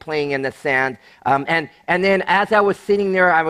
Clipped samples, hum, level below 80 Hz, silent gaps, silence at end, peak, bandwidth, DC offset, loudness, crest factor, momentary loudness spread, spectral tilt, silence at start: under 0.1%; none; -56 dBFS; none; 0 s; -2 dBFS; 12 kHz; under 0.1%; -18 LUFS; 16 dB; 7 LU; -6 dB/octave; 0.05 s